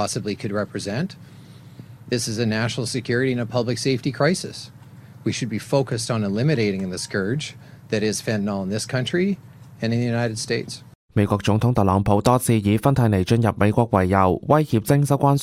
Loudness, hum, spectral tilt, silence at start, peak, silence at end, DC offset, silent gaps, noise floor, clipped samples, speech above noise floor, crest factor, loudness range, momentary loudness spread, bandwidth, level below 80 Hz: -22 LUFS; none; -6 dB/octave; 0 s; -2 dBFS; 0 s; under 0.1%; 10.95-11.08 s; -43 dBFS; under 0.1%; 22 dB; 18 dB; 6 LU; 9 LU; 16 kHz; -48 dBFS